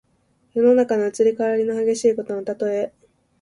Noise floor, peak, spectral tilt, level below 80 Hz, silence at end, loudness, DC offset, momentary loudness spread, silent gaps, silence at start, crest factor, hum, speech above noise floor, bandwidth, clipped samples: -64 dBFS; -6 dBFS; -5.5 dB/octave; -66 dBFS; 0.55 s; -20 LUFS; under 0.1%; 10 LU; none; 0.55 s; 14 dB; none; 44 dB; 11.5 kHz; under 0.1%